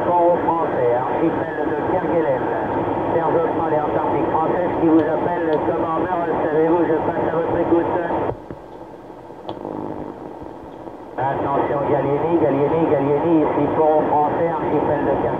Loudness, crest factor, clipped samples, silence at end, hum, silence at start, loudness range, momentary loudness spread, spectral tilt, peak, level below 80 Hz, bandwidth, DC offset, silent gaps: -19 LUFS; 14 dB; under 0.1%; 0 s; none; 0 s; 7 LU; 17 LU; -9.5 dB/octave; -6 dBFS; -48 dBFS; 4.6 kHz; 0.2%; none